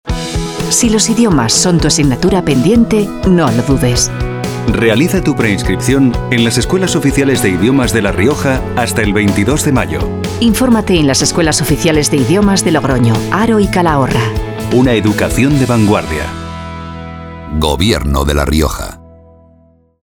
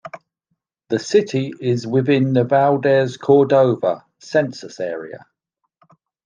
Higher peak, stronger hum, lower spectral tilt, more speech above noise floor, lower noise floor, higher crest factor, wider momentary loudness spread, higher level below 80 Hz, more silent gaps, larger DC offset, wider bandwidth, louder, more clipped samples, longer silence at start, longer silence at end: about the same, 0 dBFS vs -2 dBFS; neither; second, -5 dB/octave vs -7 dB/octave; second, 37 dB vs 57 dB; second, -48 dBFS vs -74 dBFS; about the same, 12 dB vs 16 dB; second, 9 LU vs 12 LU; first, -24 dBFS vs -68 dBFS; neither; neither; first, over 20 kHz vs 7.6 kHz; first, -11 LUFS vs -18 LUFS; neither; about the same, 0.05 s vs 0.05 s; about the same, 1.05 s vs 1.1 s